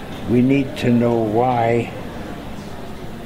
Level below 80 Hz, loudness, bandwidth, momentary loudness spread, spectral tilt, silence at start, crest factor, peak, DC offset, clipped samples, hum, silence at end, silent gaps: -40 dBFS; -18 LUFS; 15.5 kHz; 16 LU; -7.5 dB/octave; 0 s; 16 dB; -4 dBFS; 0.3%; under 0.1%; none; 0 s; none